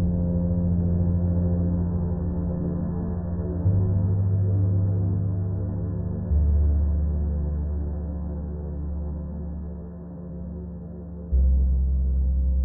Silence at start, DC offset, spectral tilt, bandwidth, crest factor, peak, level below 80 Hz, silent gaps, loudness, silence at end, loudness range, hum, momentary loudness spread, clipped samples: 0 s; under 0.1%; -16.5 dB/octave; 1.9 kHz; 12 dB; -12 dBFS; -28 dBFS; none; -26 LUFS; 0 s; 8 LU; none; 13 LU; under 0.1%